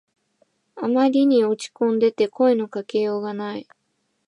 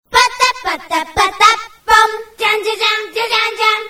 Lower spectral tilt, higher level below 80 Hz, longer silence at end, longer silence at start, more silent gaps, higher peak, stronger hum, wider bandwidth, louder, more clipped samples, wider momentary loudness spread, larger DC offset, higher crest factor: first, -6 dB/octave vs -0.5 dB/octave; second, -78 dBFS vs -44 dBFS; first, 0.65 s vs 0 s; first, 0.75 s vs 0.1 s; neither; second, -8 dBFS vs 0 dBFS; neither; second, 11 kHz vs over 20 kHz; second, -21 LUFS vs -13 LUFS; second, under 0.1% vs 0.2%; first, 12 LU vs 8 LU; neither; about the same, 14 dB vs 14 dB